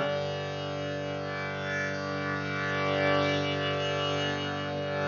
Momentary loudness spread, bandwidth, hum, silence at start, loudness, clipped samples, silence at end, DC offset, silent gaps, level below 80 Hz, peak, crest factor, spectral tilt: 7 LU; 7.2 kHz; none; 0 s; -30 LUFS; under 0.1%; 0 s; under 0.1%; none; -70 dBFS; -16 dBFS; 14 dB; -3 dB/octave